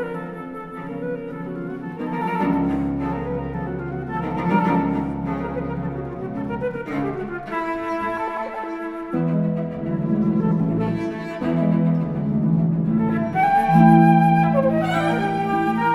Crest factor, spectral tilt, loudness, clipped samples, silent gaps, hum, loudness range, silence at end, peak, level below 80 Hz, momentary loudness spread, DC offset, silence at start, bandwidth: 20 dB; -9 dB/octave; -22 LUFS; under 0.1%; none; none; 9 LU; 0 s; -2 dBFS; -46 dBFS; 13 LU; under 0.1%; 0 s; 11 kHz